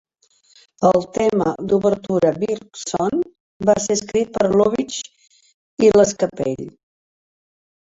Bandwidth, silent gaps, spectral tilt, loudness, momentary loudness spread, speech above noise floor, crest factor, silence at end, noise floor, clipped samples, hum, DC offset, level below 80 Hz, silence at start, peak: 8 kHz; 3.40-3.60 s, 5.54-5.77 s; -5 dB/octave; -19 LUFS; 12 LU; 41 dB; 18 dB; 1.15 s; -59 dBFS; under 0.1%; none; under 0.1%; -52 dBFS; 0.8 s; -2 dBFS